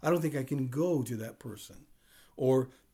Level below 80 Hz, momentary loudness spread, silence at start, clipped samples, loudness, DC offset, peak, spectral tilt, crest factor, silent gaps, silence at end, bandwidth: -68 dBFS; 16 LU; 0 s; under 0.1%; -32 LUFS; under 0.1%; -18 dBFS; -7 dB/octave; 14 dB; none; 0.25 s; 19.5 kHz